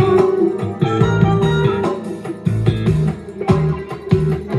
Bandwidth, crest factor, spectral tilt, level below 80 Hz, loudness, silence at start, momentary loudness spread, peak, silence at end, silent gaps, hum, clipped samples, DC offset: 11.5 kHz; 14 dB; -8.5 dB/octave; -36 dBFS; -17 LUFS; 0 s; 9 LU; -2 dBFS; 0 s; none; none; under 0.1%; under 0.1%